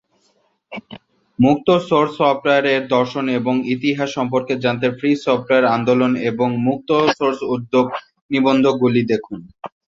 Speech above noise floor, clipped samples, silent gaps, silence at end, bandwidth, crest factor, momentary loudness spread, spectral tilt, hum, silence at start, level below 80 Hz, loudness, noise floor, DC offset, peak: 45 dB; under 0.1%; 8.21-8.29 s; 0.25 s; 7.6 kHz; 16 dB; 16 LU; -6.5 dB/octave; none; 0.7 s; -58 dBFS; -17 LUFS; -62 dBFS; under 0.1%; -2 dBFS